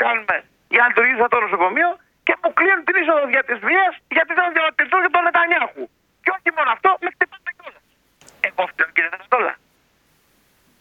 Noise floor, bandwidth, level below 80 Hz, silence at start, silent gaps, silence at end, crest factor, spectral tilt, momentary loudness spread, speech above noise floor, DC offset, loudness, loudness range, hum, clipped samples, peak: -61 dBFS; 8.4 kHz; -68 dBFS; 0 s; none; 1.25 s; 20 dB; -4.5 dB/octave; 9 LU; 43 dB; under 0.1%; -18 LUFS; 6 LU; none; under 0.1%; 0 dBFS